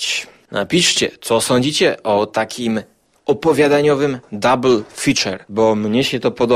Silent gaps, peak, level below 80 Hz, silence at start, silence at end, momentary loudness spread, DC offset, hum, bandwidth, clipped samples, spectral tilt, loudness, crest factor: none; -2 dBFS; -52 dBFS; 0 s; 0 s; 8 LU; under 0.1%; none; 15.5 kHz; under 0.1%; -4 dB/octave; -16 LUFS; 14 dB